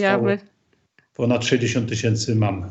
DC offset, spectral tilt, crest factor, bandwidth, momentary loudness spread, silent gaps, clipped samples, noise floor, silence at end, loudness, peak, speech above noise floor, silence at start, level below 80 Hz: under 0.1%; -5.5 dB/octave; 18 dB; 8.2 kHz; 7 LU; none; under 0.1%; -62 dBFS; 0 s; -21 LUFS; -4 dBFS; 42 dB; 0 s; -60 dBFS